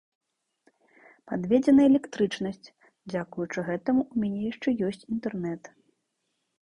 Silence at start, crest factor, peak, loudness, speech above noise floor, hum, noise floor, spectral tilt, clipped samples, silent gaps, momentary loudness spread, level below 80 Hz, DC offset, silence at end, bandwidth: 1.25 s; 18 dB; -10 dBFS; -27 LUFS; 53 dB; none; -78 dBFS; -7 dB/octave; under 0.1%; none; 15 LU; -64 dBFS; under 0.1%; 0.95 s; 10 kHz